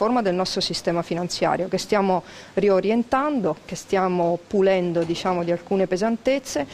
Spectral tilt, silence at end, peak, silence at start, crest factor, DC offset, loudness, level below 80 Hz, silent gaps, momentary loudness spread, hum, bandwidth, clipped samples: -5 dB/octave; 0 s; -8 dBFS; 0 s; 14 dB; under 0.1%; -22 LUFS; -54 dBFS; none; 5 LU; none; 15 kHz; under 0.1%